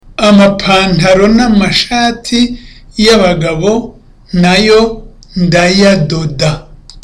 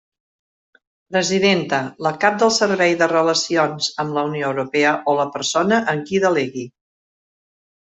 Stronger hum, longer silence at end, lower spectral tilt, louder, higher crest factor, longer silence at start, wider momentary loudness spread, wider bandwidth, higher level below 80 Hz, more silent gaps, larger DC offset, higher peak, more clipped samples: neither; second, 0.05 s vs 1.2 s; first, -5 dB/octave vs -3.5 dB/octave; first, -9 LUFS vs -18 LUFS; second, 10 dB vs 18 dB; second, 0.2 s vs 1.1 s; first, 11 LU vs 7 LU; first, 12 kHz vs 8.2 kHz; first, -28 dBFS vs -64 dBFS; neither; neither; about the same, 0 dBFS vs -2 dBFS; neither